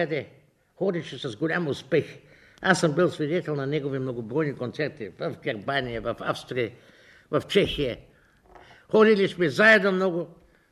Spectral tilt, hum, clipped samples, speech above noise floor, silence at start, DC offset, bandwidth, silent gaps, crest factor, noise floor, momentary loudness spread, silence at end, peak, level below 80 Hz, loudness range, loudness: -5.5 dB/octave; none; under 0.1%; 30 dB; 0 s; under 0.1%; 12.5 kHz; none; 20 dB; -54 dBFS; 14 LU; 0.4 s; -6 dBFS; -54 dBFS; 7 LU; -25 LUFS